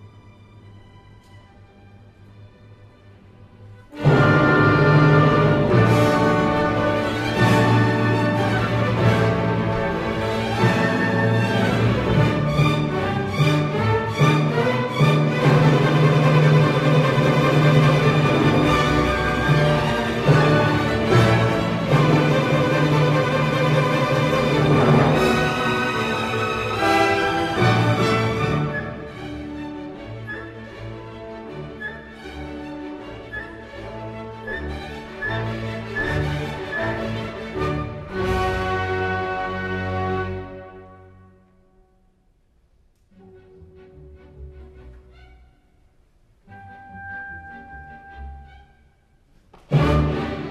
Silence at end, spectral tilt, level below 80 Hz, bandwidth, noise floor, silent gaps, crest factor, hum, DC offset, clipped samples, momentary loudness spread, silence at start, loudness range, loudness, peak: 0 s; -7 dB/octave; -40 dBFS; 13.5 kHz; -60 dBFS; none; 16 dB; none; under 0.1%; under 0.1%; 18 LU; 0 s; 17 LU; -19 LUFS; -4 dBFS